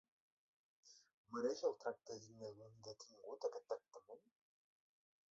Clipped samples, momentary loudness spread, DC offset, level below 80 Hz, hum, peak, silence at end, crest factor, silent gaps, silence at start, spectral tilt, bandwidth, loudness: under 0.1%; 22 LU; under 0.1%; under -90 dBFS; none; -28 dBFS; 1.15 s; 22 dB; 1.13-1.24 s; 0.85 s; -4 dB/octave; 7.6 kHz; -48 LUFS